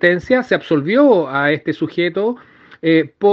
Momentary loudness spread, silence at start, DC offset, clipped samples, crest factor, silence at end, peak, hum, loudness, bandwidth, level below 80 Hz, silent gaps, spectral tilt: 9 LU; 0 s; under 0.1%; under 0.1%; 16 dB; 0 s; 0 dBFS; none; -16 LUFS; 7 kHz; -56 dBFS; none; -7.5 dB/octave